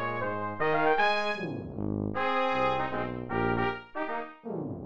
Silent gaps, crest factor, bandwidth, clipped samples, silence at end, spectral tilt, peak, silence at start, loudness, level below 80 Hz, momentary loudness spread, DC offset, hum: none; 16 dB; 8 kHz; under 0.1%; 0 s; -6.5 dB/octave; -14 dBFS; 0 s; -30 LUFS; -52 dBFS; 11 LU; 0.6%; none